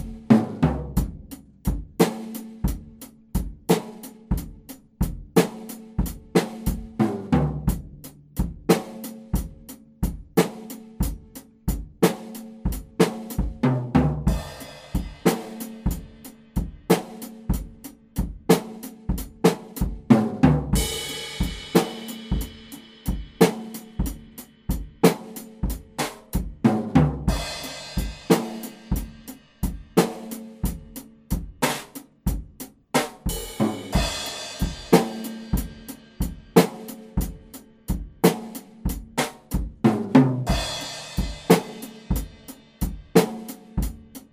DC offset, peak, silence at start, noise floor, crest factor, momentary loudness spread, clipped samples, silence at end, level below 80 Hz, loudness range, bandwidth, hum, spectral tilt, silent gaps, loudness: under 0.1%; 0 dBFS; 0 s; -46 dBFS; 24 dB; 18 LU; under 0.1%; 0.1 s; -34 dBFS; 5 LU; 16 kHz; none; -5.5 dB/octave; none; -25 LUFS